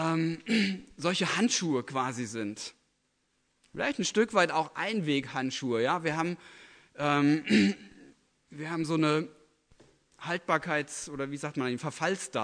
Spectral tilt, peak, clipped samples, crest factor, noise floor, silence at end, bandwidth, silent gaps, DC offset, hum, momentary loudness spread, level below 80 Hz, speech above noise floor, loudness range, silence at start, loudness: -4.5 dB/octave; -10 dBFS; under 0.1%; 20 dB; -75 dBFS; 0 s; 10.5 kHz; none; under 0.1%; none; 12 LU; -70 dBFS; 46 dB; 3 LU; 0 s; -30 LUFS